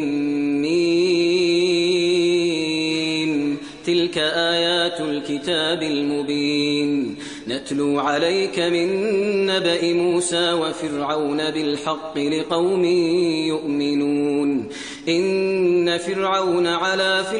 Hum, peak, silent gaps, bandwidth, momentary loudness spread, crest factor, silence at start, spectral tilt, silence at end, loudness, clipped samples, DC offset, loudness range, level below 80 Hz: none; -6 dBFS; none; 10.5 kHz; 6 LU; 14 dB; 0 s; -4 dB/octave; 0 s; -20 LUFS; under 0.1%; under 0.1%; 2 LU; -62 dBFS